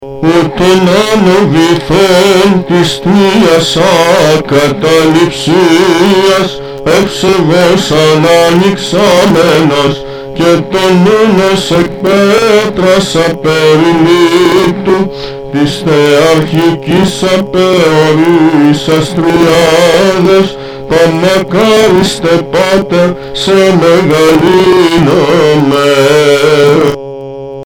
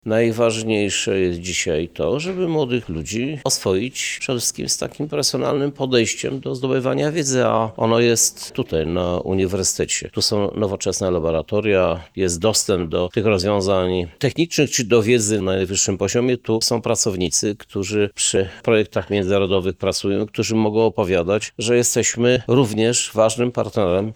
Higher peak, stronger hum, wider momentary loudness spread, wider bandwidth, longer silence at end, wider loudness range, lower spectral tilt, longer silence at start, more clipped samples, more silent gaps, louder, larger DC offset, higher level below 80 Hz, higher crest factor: first, 0 dBFS vs -4 dBFS; neither; about the same, 5 LU vs 6 LU; about the same, 18.5 kHz vs over 20 kHz; about the same, 0 s vs 0 s; about the same, 1 LU vs 3 LU; about the same, -5 dB/octave vs -4 dB/octave; about the same, 0 s vs 0.05 s; neither; neither; first, -7 LUFS vs -19 LUFS; first, 0.7% vs under 0.1%; first, -36 dBFS vs -46 dBFS; second, 6 dB vs 16 dB